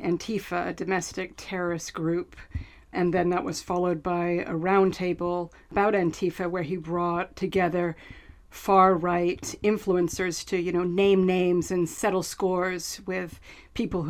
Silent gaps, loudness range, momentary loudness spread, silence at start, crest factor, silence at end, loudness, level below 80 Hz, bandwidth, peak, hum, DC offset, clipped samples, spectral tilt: none; 5 LU; 11 LU; 0 s; 20 dB; 0 s; -26 LUFS; -50 dBFS; 15 kHz; -6 dBFS; none; under 0.1%; under 0.1%; -5.5 dB/octave